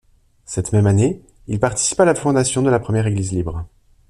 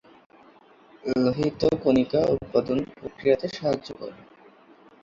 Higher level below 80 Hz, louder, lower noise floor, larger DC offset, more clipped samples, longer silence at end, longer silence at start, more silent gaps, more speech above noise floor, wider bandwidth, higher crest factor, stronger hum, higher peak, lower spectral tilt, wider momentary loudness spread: first, -42 dBFS vs -54 dBFS; first, -18 LUFS vs -25 LUFS; second, -42 dBFS vs -54 dBFS; neither; neither; second, 0.4 s vs 0.9 s; second, 0.5 s vs 1.05 s; neither; second, 25 dB vs 30 dB; first, 12 kHz vs 7.4 kHz; about the same, 16 dB vs 18 dB; neither; first, -2 dBFS vs -8 dBFS; second, -5.5 dB/octave vs -7 dB/octave; about the same, 13 LU vs 15 LU